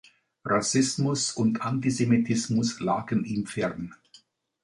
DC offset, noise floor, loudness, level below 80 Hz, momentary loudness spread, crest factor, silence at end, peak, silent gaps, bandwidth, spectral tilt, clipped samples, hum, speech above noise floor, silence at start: under 0.1%; -59 dBFS; -26 LUFS; -62 dBFS; 7 LU; 16 dB; 0.7 s; -10 dBFS; none; 11.5 kHz; -5 dB/octave; under 0.1%; none; 33 dB; 0.45 s